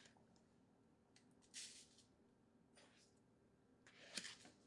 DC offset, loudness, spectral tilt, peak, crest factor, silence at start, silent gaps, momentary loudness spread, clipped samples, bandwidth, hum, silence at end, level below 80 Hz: under 0.1%; -55 LUFS; -1 dB/octave; -30 dBFS; 34 dB; 0 s; none; 17 LU; under 0.1%; 12 kHz; none; 0 s; under -90 dBFS